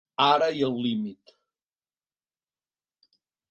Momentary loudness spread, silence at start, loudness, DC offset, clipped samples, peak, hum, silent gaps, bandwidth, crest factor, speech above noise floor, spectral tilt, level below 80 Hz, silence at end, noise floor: 11 LU; 0.2 s; -24 LUFS; under 0.1%; under 0.1%; -6 dBFS; none; none; 7.8 kHz; 22 dB; over 65 dB; -5.5 dB/octave; -76 dBFS; 2.35 s; under -90 dBFS